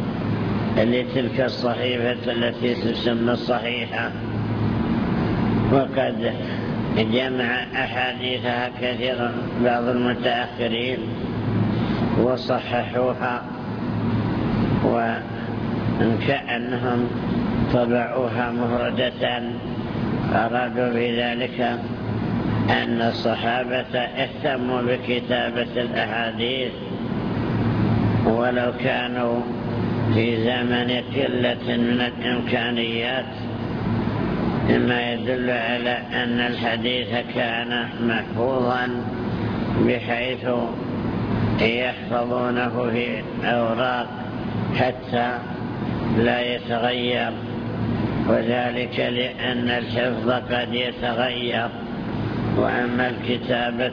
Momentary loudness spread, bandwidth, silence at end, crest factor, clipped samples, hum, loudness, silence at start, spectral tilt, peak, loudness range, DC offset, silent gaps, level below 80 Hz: 6 LU; 5.4 kHz; 0 s; 18 dB; under 0.1%; none; -23 LUFS; 0 s; -8 dB/octave; -4 dBFS; 1 LU; under 0.1%; none; -44 dBFS